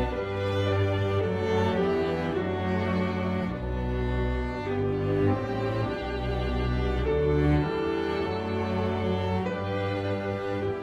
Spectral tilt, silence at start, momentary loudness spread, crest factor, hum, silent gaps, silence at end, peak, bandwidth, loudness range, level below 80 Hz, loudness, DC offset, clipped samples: -8 dB/octave; 0 s; 5 LU; 14 dB; none; none; 0 s; -12 dBFS; 8 kHz; 2 LU; -38 dBFS; -28 LUFS; under 0.1%; under 0.1%